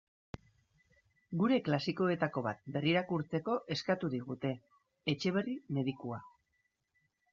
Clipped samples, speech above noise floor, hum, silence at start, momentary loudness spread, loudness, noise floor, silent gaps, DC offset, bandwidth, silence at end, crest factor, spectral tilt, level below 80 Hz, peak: under 0.1%; 46 dB; none; 1.3 s; 14 LU; -35 LUFS; -81 dBFS; none; under 0.1%; 7.4 kHz; 1.05 s; 18 dB; -5 dB/octave; -70 dBFS; -18 dBFS